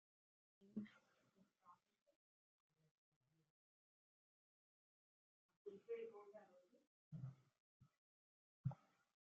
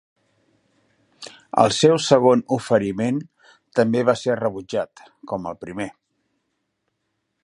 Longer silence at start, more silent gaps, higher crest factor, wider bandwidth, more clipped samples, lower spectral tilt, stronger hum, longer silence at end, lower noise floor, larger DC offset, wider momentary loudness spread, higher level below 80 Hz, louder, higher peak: second, 0.6 s vs 1.2 s; first, 2.02-2.06 s, 2.16-2.70 s, 2.91-3.21 s, 3.50-5.49 s, 5.57-5.65 s, 6.87-7.11 s, 7.60-7.80 s, 7.98-8.64 s vs none; first, 28 dB vs 22 dB; second, 6.8 kHz vs 11.5 kHz; neither; first, -9 dB/octave vs -5 dB/octave; neither; second, 0.55 s vs 1.55 s; first, -80 dBFS vs -75 dBFS; neither; second, 12 LU vs 16 LU; second, under -90 dBFS vs -60 dBFS; second, -56 LUFS vs -20 LUFS; second, -34 dBFS vs 0 dBFS